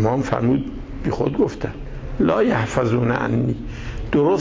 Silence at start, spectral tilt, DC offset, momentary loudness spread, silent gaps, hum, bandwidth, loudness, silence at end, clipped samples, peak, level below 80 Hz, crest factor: 0 s; -7.5 dB/octave; under 0.1%; 13 LU; none; none; 8 kHz; -21 LUFS; 0 s; under 0.1%; -6 dBFS; -34 dBFS; 14 dB